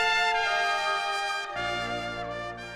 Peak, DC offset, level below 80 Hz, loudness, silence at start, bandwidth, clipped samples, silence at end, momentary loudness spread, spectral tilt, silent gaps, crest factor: -12 dBFS; under 0.1%; -54 dBFS; -28 LUFS; 0 s; 15 kHz; under 0.1%; 0 s; 10 LU; -2 dB/octave; none; 16 dB